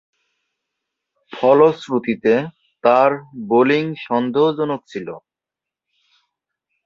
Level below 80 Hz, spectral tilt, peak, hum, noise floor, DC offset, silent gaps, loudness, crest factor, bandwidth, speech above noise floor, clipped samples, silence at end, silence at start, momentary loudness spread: -66 dBFS; -7 dB/octave; -2 dBFS; none; -87 dBFS; under 0.1%; none; -17 LUFS; 18 dB; 7.4 kHz; 70 dB; under 0.1%; 1.7 s; 1.3 s; 16 LU